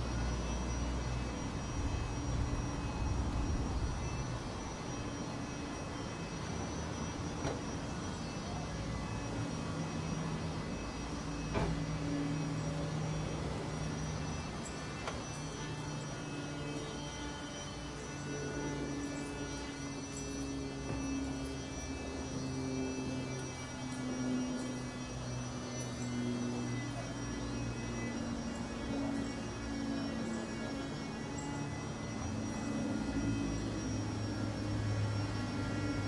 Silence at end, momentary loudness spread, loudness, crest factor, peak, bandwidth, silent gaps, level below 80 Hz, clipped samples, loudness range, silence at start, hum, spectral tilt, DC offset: 0 s; 5 LU; -39 LUFS; 18 dB; -20 dBFS; 11.5 kHz; none; -46 dBFS; under 0.1%; 3 LU; 0 s; none; -5.5 dB/octave; under 0.1%